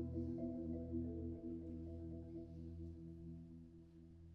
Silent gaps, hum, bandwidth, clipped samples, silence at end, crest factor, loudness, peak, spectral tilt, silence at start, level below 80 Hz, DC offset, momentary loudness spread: none; none; 5.2 kHz; under 0.1%; 0 s; 16 dB; -49 LUFS; -34 dBFS; -12 dB/octave; 0 s; -62 dBFS; under 0.1%; 14 LU